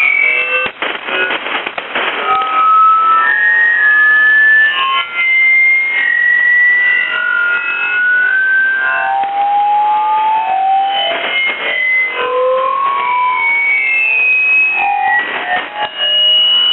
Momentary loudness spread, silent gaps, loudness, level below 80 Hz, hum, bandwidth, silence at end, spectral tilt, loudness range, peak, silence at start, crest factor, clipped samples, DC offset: 8 LU; none; -10 LUFS; -62 dBFS; none; 4.2 kHz; 0 s; -3 dB/octave; 5 LU; -2 dBFS; 0 s; 10 dB; under 0.1%; under 0.1%